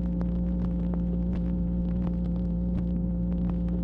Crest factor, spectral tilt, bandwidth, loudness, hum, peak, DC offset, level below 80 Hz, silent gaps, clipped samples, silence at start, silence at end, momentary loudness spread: 12 dB; -12 dB/octave; 3.2 kHz; -29 LUFS; none; -16 dBFS; under 0.1%; -32 dBFS; none; under 0.1%; 0 s; 0 s; 0 LU